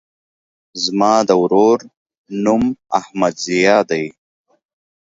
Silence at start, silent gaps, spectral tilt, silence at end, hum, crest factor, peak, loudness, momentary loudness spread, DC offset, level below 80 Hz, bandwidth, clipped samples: 0.75 s; 1.97-2.06 s, 2.17-2.25 s; -4.5 dB/octave; 1.05 s; none; 18 dB; 0 dBFS; -16 LUFS; 9 LU; under 0.1%; -54 dBFS; 7.8 kHz; under 0.1%